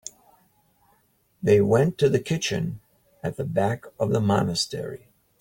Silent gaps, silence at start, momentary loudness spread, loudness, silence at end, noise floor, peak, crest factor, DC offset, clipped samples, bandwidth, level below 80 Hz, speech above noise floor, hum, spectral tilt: none; 1.4 s; 15 LU; -24 LUFS; 0.45 s; -65 dBFS; -8 dBFS; 18 dB; under 0.1%; under 0.1%; 17 kHz; -56 dBFS; 42 dB; none; -5.5 dB/octave